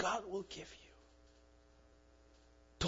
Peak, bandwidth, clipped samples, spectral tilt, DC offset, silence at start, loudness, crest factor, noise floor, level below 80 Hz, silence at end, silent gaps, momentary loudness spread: -24 dBFS; 7.4 kHz; under 0.1%; -3 dB/octave; under 0.1%; 0 s; -44 LUFS; 22 dB; -66 dBFS; -60 dBFS; 0 s; none; 25 LU